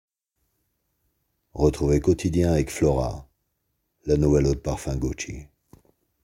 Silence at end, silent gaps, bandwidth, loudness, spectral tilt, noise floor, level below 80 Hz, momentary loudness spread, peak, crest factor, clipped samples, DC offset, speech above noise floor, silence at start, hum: 0.8 s; none; 16 kHz; -23 LUFS; -7 dB/octave; -76 dBFS; -36 dBFS; 15 LU; -6 dBFS; 20 dB; under 0.1%; under 0.1%; 53 dB; 1.55 s; none